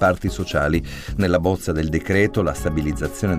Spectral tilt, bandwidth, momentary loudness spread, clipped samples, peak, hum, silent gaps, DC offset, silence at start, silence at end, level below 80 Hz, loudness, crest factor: -6.5 dB/octave; 16 kHz; 5 LU; under 0.1%; -4 dBFS; none; none; under 0.1%; 0 s; 0 s; -32 dBFS; -21 LUFS; 16 dB